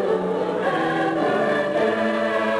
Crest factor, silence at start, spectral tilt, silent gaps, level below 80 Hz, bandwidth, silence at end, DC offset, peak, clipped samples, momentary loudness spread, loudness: 12 dB; 0 s; -6 dB/octave; none; -60 dBFS; 11 kHz; 0 s; under 0.1%; -10 dBFS; under 0.1%; 2 LU; -22 LUFS